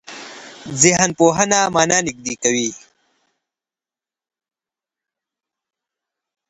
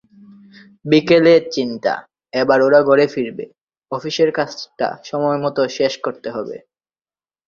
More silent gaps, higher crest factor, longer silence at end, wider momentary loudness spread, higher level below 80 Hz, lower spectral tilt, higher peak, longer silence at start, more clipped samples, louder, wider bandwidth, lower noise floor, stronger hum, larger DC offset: second, none vs 3.63-3.67 s; about the same, 22 dB vs 18 dB; first, 3.7 s vs 0.9 s; first, 21 LU vs 16 LU; first, -56 dBFS vs -62 dBFS; second, -3 dB/octave vs -5.5 dB/octave; about the same, 0 dBFS vs 0 dBFS; second, 0.1 s vs 0.85 s; neither; about the same, -16 LUFS vs -17 LUFS; first, 9 kHz vs 7.4 kHz; about the same, under -90 dBFS vs under -90 dBFS; neither; neither